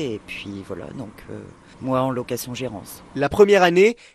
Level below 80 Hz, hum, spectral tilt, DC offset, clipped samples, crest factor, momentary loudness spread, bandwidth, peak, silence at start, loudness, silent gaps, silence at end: -52 dBFS; none; -5.5 dB/octave; under 0.1%; under 0.1%; 18 dB; 22 LU; 13.5 kHz; -2 dBFS; 0 s; -19 LUFS; none; 0.2 s